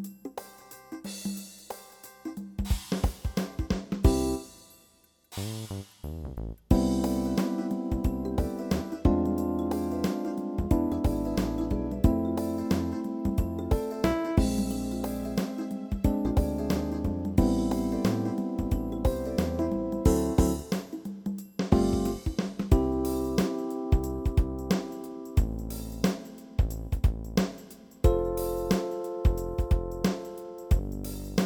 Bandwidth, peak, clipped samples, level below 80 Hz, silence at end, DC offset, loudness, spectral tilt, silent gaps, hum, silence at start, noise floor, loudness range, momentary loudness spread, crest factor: 19.5 kHz; -4 dBFS; under 0.1%; -34 dBFS; 0 s; under 0.1%; -29 LUFS; -7 dB/octave; none; none; 0 s; -63 dBFS; 3 LU; 13 LU; 24 dB